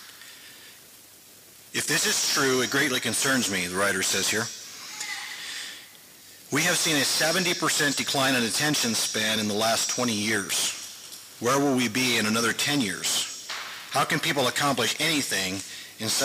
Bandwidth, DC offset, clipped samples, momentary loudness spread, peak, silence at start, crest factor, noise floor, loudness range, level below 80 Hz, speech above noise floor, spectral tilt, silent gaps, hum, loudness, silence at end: 16 kHz; under 0.1%; under 0.1%; 13 LU; -14 dBFS; 0 s; 14 dB; -51 dBFS; 4 LU; -70 dBFS; 26 dB; -2 dB/octave; none; none; -24 LUFS; 0 s